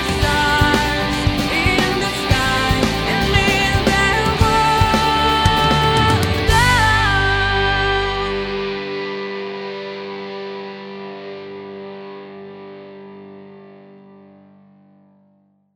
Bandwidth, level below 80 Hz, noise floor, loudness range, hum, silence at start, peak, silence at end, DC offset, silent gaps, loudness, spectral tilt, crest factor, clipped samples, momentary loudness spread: 17.5 kHz; -28 dBFS; -58 dBFS; 19 LU; 50 Hz at -45 dBFS; 0 s; -2 dBFS; 2 s; under 0.1%; none; -16 LUFS; -4.5 dB/octave; 18 dB; under 0.1%; 18 LU